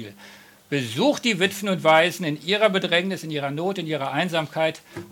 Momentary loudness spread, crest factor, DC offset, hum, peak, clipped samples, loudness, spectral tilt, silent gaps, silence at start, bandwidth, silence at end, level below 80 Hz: 10 LU; 20 dB; under 0.1%; none; -4 dBFS; under 0.1%; -22 LUFS; -4.5 dB/octave; none; 0 s; 17.5 kHz; 0.05 s; -72 dBFS